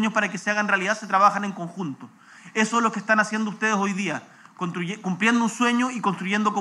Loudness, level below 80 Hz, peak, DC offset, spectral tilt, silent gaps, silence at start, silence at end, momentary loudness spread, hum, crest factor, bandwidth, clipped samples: -23 LUFS; -88 dBFS; -4 dBFS; under 0.1%; -4.5 dB/octave; none; 0 s; 0 s; 12 LU; none; 20 dB; 12 kHz; under 0.1%